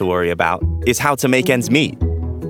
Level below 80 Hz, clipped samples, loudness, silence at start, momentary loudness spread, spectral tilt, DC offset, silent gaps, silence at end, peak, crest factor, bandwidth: -32 dBFS; under 0.1%; -17 LUFS; 0 s; 5 LU; -5 dB/octave; under 0.1%; none; 0 s; 0 dBFS; 16 dB; 18.5 kHz